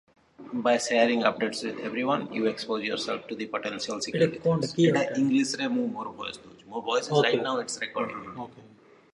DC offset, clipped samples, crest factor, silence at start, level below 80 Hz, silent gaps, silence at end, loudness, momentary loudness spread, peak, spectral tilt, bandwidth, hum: under 0.1%; under 0.1%; 22 dB; 0.4 s; -70 dBFS; none; 0.45 s; -27 LUFS; 13 LU; -4 dBFS; -4.5 dB/octave; 11.5 kHz; none